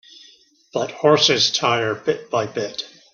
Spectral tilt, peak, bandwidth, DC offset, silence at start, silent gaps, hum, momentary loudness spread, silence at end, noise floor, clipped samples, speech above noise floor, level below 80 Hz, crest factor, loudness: -3 dB/octave; -2 dBFS; 7.2 kHz; under 0.1%; 0.75 s; none; none; 13 LU; 0.25 s; -52 dBFS; under 0.1%; 33 dB; -64 dBFS; 18 dB; -19 LUFS